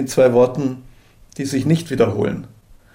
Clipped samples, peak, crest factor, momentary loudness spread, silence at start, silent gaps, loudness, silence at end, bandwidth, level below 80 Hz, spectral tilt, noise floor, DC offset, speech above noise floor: under 0.1%; -4 dBFS; 16 dB; 17 LU; 0 s; none; -18 LUFS; 0.45 s; 16 kHz; -48 dBFS; -6.5 dB/octave; -46 dBFS; under 0.1%; 29 dB